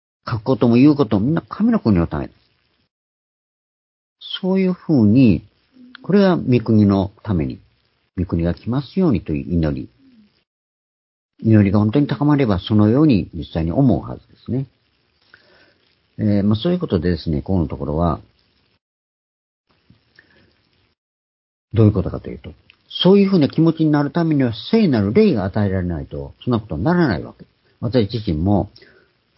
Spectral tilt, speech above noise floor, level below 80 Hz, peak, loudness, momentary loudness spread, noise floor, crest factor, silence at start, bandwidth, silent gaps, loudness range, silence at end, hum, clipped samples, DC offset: -12 dB/octave; 46 dB; -38 dBFS; 0 dBFS; -18 LUFS; 14 LU; -63 dBFS; 18 dB; 0.25 s; 5.8 kHz; 2.91-4.16 s, 10.47-11.29 s, 18.81-19.64 s, 20.98-21.68 s; 7 LU; 0.7 s; none; under 0.1%; under 0.1%